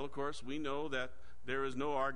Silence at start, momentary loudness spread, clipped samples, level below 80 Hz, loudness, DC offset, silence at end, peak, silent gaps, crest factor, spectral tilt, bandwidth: 0 s; 6 LU; under 0.1%; -60 dBFS; -40 LUFS; 1%; 0 s; -22 dBFS; none; 16 dB; -5 dB/octave; 10.5 kHz